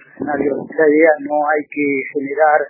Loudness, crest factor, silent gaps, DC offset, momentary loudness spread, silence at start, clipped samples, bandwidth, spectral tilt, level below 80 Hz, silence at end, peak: -16 LUFS; 16 dB; none; under 0.1%; 8 LU; 0.2 s; under 0.1%; 2.8 kHz; -12 dB/octave; -62 dBFS; 0 s; 0 dBFS